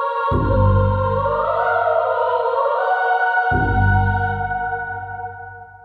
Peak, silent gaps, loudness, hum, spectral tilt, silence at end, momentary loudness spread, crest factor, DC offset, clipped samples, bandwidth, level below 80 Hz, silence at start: -4 dBFS; none; -18 LUFS; none; -9.5 dB/octave; 0.05 s; 11 LU; 14 dB; under 0.1%; under 0.1%; 4.7 kHz; -30 dBFS; 0 s